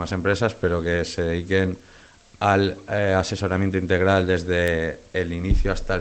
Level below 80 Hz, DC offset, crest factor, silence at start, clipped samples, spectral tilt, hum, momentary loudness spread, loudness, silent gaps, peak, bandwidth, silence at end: -32 dBFS; under 0.1%; 18 dB; 0 s; under 0.1%; -6 dB/octave; none; 6 LU; -23 LUFS; none; -4 dBFS; 9 kHz; 0 s